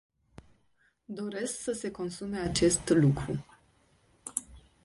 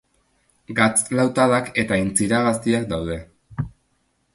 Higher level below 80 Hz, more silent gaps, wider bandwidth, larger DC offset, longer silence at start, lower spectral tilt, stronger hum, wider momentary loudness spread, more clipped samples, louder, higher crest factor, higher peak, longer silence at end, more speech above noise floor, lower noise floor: second, -54 dBFS vs -46 dBFS; neither; about the same, 11.5 kHz vs 12 kHz; neither; first, 1.1 s vs 0.7 s; about the same, -5 dB/octave vs -4.5 dB/octave; neither; about the same, 14 LU vs 14 LU; neither; second, -30 LUFS vs -20 LUFS; about the same, 22 dB vs 20 dB; second, -10 dBFS vs -2 dBFS; second, 0.25 s vs 0.65 s; second, 41 dB vs 47 dB; first, -71 dBFS vs -67 dBFS